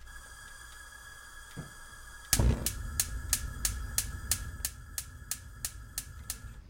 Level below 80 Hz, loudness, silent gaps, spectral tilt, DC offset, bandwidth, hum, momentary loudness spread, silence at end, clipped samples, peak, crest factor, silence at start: -40 dBFS; -34 LUFS; none; -2.5 dB/octave; under 0.1%; 16.5 kHz; none; 18 LU; 0 s; under 0.1%; -4 dBFS; 32 dB; 0 s